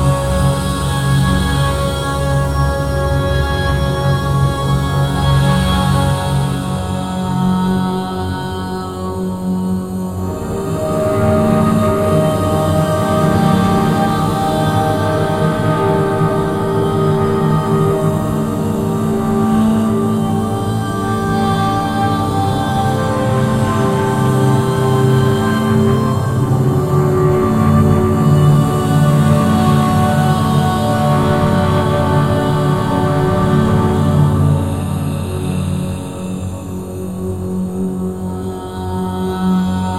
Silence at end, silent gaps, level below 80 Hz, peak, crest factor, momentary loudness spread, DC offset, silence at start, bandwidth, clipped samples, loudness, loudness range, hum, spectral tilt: 0 s; none; -30 dBFS; 0 dBFS; 14 dB; 8 LU; 0.4%; 0 s; 16 kHz; under 0.1%; -15 LUFS; 6 LU; none; -7 dB/octave